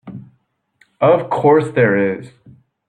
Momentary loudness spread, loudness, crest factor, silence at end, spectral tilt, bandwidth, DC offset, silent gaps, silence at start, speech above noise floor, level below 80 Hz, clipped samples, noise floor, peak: 12 LU; -15 LUFS; 16 dB; 0.6 s; -8 dB/octave; 9.4 kHz; under 0.1%; none; 0.05 s; 49 dB; -60 dBFS; under 0.1%; -63 dBFS; -2 dBFS